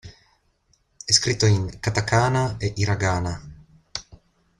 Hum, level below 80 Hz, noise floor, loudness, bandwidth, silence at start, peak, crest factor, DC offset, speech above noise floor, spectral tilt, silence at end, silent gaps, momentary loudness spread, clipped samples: none; -46 dBFS; -65 dBFS; -22 LUFS; 11.5 kHz; 0.05 s; -2 dBFS; 22 dB; under 0.1%; 44 dB; -4 dB/octave; 0.6 s; none; 16 LU; under 0.1%